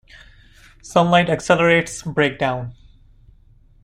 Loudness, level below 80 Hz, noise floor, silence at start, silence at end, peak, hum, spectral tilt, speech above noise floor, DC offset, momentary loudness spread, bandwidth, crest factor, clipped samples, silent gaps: -18 LUFS; -48 dBFS; -51 dBFS; 0.85 s; 1.1 s; -2 dBFS; none; -5 dB/octave; 33 dB; under 0.1%; 10 LU; 12 kHz; 20 dB; under 0.1%; none